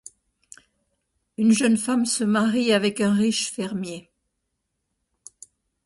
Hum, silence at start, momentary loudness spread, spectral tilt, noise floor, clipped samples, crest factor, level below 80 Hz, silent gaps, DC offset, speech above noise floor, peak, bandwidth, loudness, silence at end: none; 1.4 s; 12 LU; -4 dB/octave; -78 dBFS; under 0.1%; 16 dB; -66 dBFS; none; under 0.1%; 57 dB; -8 dBFS; 11.5 kHz; -22 LUFS; 1.85 s